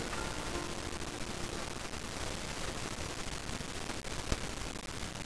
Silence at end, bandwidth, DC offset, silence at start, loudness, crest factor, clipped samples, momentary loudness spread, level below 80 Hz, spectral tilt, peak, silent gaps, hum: 0 s; 11 kHz; 0.4%; 0 s; -40 LUFS; 26 dB; under 0.1%; 3 LU; -46 dBFS; -3.5 dB/octave; -14 dBFS; none; none